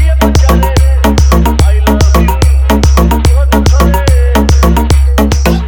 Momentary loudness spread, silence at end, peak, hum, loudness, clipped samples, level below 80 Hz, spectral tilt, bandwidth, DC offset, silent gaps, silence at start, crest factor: 1 LU; 0 s; 0 dBFS; none; -8 LUFS; under 0.1%; -8 dBFS; -6 dB/octave; 18.5 kHz; 0.6%; none; 0 s; 6 dB